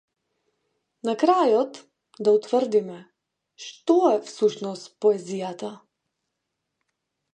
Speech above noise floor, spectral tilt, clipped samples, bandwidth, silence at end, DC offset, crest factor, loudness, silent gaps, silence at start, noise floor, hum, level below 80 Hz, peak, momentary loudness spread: 58 dB; -5.5 dB/octave; under 0.1%; 9.4 kHz; 1.55 s; under 0.1%; 20 dB; -23 LUFS; none; 1.05 s; -81 dBFS; none; -80 dBFS; -6 dBFS; 17 LU